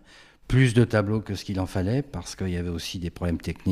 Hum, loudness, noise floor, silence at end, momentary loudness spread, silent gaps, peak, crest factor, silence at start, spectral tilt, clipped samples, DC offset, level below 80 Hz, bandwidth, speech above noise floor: none; -26 LUFS; -49 dBFS; 0 s; 11 LU; none; -6 dBFS; 18 dB; 0.5 s; -6.5 dB/octave; under 0.1%; under 0.1%; -42 dBFS; 14 kHz; 24 dB